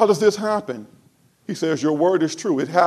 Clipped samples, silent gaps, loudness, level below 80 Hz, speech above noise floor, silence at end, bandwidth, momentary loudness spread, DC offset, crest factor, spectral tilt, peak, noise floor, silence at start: under 0.1%; none; -20 LUFS; -68 dBFS; 38 dB; 0 s; 13 kHz; 15 LU; under 0.1%; 18 dB; -5 dB/octave; -2 dBFS; -57 dBFS; 0 s